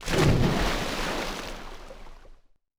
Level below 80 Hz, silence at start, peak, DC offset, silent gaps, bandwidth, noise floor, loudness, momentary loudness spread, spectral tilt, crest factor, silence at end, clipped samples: -34 dBFS; 0 s; -10 dBFS; under 0.1%; none; over 20 kHz; -52 dBFS; -26 LUFS; 23 LU; -5 dB/octave; 18 dB; 0.45 s; under 0.1%